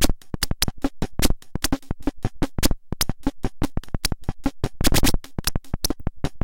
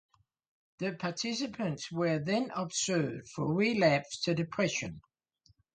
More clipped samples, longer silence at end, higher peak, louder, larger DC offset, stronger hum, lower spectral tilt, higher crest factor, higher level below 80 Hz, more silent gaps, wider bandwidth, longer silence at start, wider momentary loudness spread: neither; second, 0 s vs 0.75 s; first, 0 dBFS vs -14 dBFS; first, -26 LUFS vs -32 LUFS; neither; neither; about the same, -4 dB/octave vs -4.5 dB/octave; about the same, 20 dB vs 20 dB; first, -28 dBFS vs -68 dBFS; neither; first, 17 kHz vs 9.6 kHz; second, 0 s vs 0.8 s; about the same, 8 LU vs 9 LU